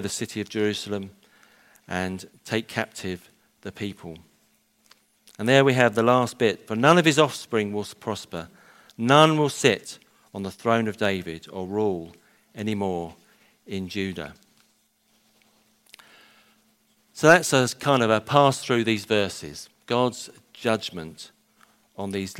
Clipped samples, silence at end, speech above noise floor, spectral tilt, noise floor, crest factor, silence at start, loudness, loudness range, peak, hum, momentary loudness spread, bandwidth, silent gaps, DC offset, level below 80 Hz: under 0.1%; 0 s; 42 dB; -4.5 dB/octave; -66 dBFS; 24 dB; 0 s; -23 LUFS; 12 LU; -2 dBFS; none; 22 LU; 16 kHz; none; under 0.1%; -64 dBFS